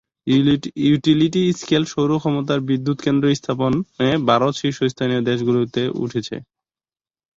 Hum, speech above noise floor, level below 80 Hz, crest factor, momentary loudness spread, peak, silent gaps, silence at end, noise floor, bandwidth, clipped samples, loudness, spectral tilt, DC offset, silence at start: none; over 72 dB; -54 dBFS; 16 dB; 6 LU; -2 dBFS; none; 0.95 s; under -90 dBFS; 7.8 kHz; under 0.1%; -19 LUFS; -6.5 dB/octave; under 0.1%; 0.25 s